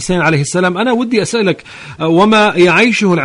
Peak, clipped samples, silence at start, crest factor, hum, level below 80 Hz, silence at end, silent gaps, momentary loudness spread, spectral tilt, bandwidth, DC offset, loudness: 0 dBFS; under 0.1%; 0 s; 12 dB; none; -44 dBFS; 0 s; none; 9 LU; -5 dB/octave; 11 kHz; under 0.1%; -11 LUFS